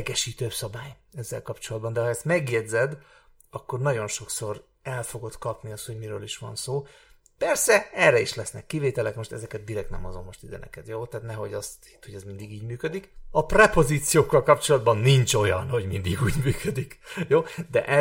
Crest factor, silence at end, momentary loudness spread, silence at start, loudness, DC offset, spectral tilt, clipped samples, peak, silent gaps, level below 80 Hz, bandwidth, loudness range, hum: 24 dB; 0 s; 19 LU; 0 s; -25 LUFS; under 0.1%; -4.5 dB/octave; under 0.1%; -2 dBFS; none; -44 dBFS; 17 kHz; 13 LU; none